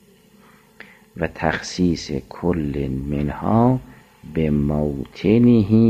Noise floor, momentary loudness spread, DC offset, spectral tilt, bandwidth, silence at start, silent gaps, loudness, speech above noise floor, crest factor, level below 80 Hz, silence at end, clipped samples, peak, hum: -51 dBFS; 12 LU; under 0.1%; -7.5 dB/octave; 8.8 kHz; 1.15 s; none; -20 LUFS; 33 dB; 16 dB; -38 dBFS; 0 s; under 0.1%; -4 dBFS; none